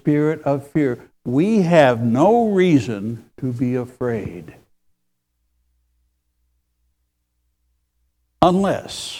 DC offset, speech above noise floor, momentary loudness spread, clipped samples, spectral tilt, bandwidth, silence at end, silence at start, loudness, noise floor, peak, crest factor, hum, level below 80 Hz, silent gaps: under 0.1%; 54 dB; 13 LU; under 0.1%; -7 dB/octave; 14.5 kHz; 0 s; 0.05 s; -18 LUFS; -72 dBFS; 0 dBFS; 20 dB; 60 Hz at -45 dBFS; -52 dBFS; none